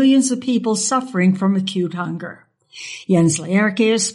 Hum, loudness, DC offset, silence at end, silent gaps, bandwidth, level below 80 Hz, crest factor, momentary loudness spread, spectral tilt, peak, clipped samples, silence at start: none; -18 LUFS; under 0.1%; 0 s; none; 11.5 kHz; -62 dBFS; 12 dB; 14 LU; -5 dB/octave; -4 dBFS; under 0.1%; 0 s